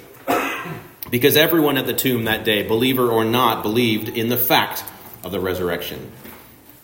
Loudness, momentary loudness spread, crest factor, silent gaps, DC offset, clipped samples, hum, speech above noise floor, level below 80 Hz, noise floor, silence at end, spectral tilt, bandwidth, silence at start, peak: -19 LUFS; 17 LU; 18 dB; none; under 0.1%; under 0.1%; none; 26 dB; -54 dBFS; -44 dBFS; 0.4 s; -4.5 dB/octave; 16.5 kHz; 0 s; -2 dBFS